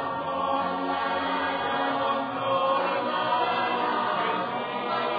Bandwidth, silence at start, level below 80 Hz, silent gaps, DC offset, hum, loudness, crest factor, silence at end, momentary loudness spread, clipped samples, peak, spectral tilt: 5 kHz; 0 s; -68 dBFS; none; under 0.1%; none; -26 LUFS; 14 dB; 0 s; 4 LU; under 0.1%; -14 dBFS; -7 dB/octave